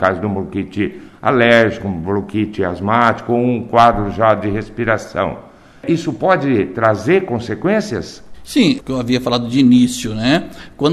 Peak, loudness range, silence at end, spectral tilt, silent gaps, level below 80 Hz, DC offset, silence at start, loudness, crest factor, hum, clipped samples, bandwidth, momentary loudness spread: 0 dBFS; 3 LU; 0 s; -6 dB/octave; none; -40 dBFS; under 0.1%; 0 s; -16 LUFS; 16 dB; none; under 0.1%; 13.5 kHz; 10 LU